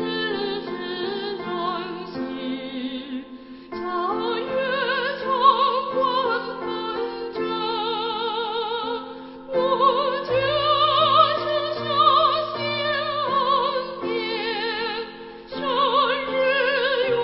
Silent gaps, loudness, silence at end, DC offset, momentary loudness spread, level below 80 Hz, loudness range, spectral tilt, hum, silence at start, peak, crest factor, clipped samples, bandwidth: none; -23 LUFS; 0 s; under 0.1%; 13 LU; -58 dBFS; 9 LU; -8.5 dB/octave; none; 0 s; -4 dBFS; 20 dB; under 0.1%; 5.8 kHz